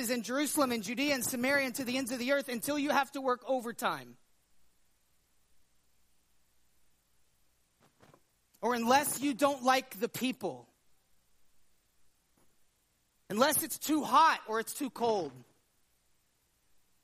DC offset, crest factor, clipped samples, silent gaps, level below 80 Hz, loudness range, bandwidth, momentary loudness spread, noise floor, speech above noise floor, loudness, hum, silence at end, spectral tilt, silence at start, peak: under 0.1%; 24 dB; under 0.1%; none; -78 dBFS; 11 LU; 15.5 kHz; 9 LU; -74 dBFS; 43 dB; -31 LUFS; none; 1.6 s; -2.5 dB/octave; 0 s; -12 dBFS